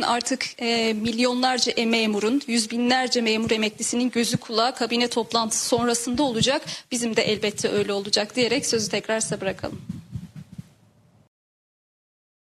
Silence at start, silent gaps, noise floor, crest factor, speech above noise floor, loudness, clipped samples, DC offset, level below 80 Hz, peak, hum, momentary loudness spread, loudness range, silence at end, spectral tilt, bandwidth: 0 s; none; -57 dBFS; 18 dB; 34 dB; -23 LUFS; under 0.1%; under 0.1%; -60 dBFS; -6 dBFS; none; 8 LU; 7 LU; 1.95 s; -3 dB/octave; 14.5 kHz